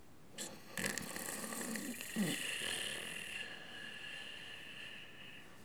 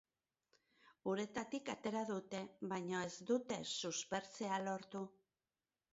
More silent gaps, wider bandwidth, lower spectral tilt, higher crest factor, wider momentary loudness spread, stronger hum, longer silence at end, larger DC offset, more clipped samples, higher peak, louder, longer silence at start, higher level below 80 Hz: neither; first, over 20 kHz vs 7.6 kHz; second, -2 dB/octave vs -3.5 dB/octave; first, 28 dB vs 18 dB; first, 11 LU vs 8 LU; neither; second, 0 s vs 0.8 s; first, 0.1% vs under 0.1%; neither; first, -16 dBFS vs -26 dBFS; about the same, -42 LUFS vs -43 LUFS; second, 0 s vs 1.05 s; first, -74 dBFS vs -82 dBFS